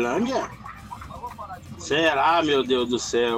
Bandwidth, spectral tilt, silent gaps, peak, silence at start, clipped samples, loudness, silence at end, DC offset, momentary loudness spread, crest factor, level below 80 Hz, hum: 15.5 kHz; -3.5 dB/octave; none; -8 dBFS; 0 s; under 0.1%; -22 LUFS; 0 s; under 0.1%; 19 LU; 16 dB; -50 dBFS; none